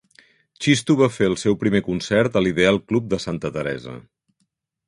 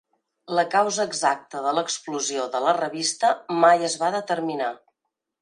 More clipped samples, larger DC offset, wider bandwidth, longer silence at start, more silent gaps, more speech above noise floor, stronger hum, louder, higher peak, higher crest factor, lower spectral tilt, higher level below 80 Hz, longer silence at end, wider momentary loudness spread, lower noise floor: neither; neither; about the same, 11.5 kHz vs 11 kHz; about the same, 0.6 s vs 0.5 s; neither; second, 52 dB vs 59 dB; neither; first, -20 LUFS vs -23 LUFS; about the same, -2 dBFS vs -4 dBFS; about the same, 20 dB vs 20 dB; first, -5.5 dB/octave vs -2.5 dB/octave; first, -50 dBFS vs -80 dBFS; first, 0.85 s vs 0.65 s; about the same, 10 LU vs 9 LU; second, -72 dBFS vs -81 dBFS